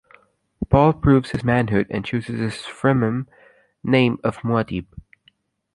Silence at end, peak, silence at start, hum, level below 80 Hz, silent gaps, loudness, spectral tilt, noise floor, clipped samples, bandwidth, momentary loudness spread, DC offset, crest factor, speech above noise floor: 0.75 s; -2 dBFS; 0.6 s; none; -40 dBFS; none; -20 LUFS; -8 dB/octave; -61 dBFS; under 0.1%; 11.5 kHz; 12 LU; under 0.1%; 20 dB; 41 dB